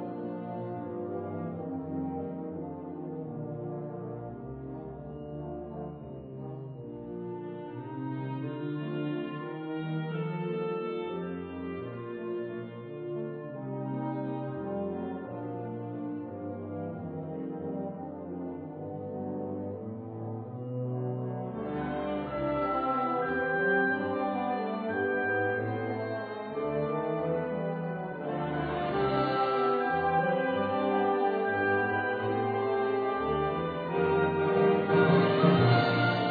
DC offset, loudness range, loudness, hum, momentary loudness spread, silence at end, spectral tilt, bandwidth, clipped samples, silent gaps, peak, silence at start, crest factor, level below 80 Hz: under 0.1%; 11 LU; -32 LUFS; none; 13 LU; 0 s; -5.5 dB/octave; 4.9 kHz; under 0.1%; none; -12 dBFS; 0 s; 20 dB; -60 dBFS